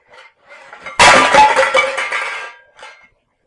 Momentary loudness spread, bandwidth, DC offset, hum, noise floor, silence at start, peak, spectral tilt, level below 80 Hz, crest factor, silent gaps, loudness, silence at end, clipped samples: 20 LU; 11.5 kHz; under 0.1%; none; -52 dBFS; 0.7 s; 0 dBFS; -1.5 dB/octave; -44 dBFS; 14 dB; none; -10 LUFS; 0.55 s; under 0.1%